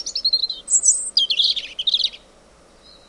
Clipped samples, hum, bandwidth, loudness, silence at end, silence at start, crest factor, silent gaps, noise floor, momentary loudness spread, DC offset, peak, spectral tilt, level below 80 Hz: under 0.1%; none; 11.5 kHz; -17 LUFS; 0.95 s; 0 s; 20 dB; none; -50 dBFS; 5 LU; under 0.1%; -2 dBFS; 4 dB/octave; -58 dBFS